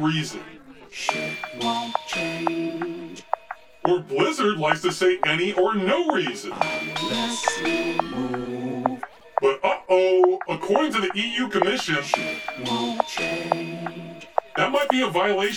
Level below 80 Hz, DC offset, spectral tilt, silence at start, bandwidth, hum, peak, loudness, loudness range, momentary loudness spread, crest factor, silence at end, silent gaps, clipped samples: -62 dBFS; under 0.1%; -4 dB/octave; 0 s; 17.5 kHz; none; -2 dBFS; -24 LUFS; 4 LU; 10 LU; 22 dB; 0 s; none; under 0.1%